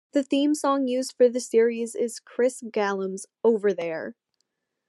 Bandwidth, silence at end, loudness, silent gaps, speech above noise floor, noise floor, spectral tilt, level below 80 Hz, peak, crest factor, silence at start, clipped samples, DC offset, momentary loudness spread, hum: 12.5 kHz; 0.75 s; -25 LUFS; none; 53 dB; -77 dBFS; -4.5 dB/octave; -88 dBFS; -10 dBFS; 16 dB; 0.15 s; under 0.1%; under 0.1%; 8 LU; none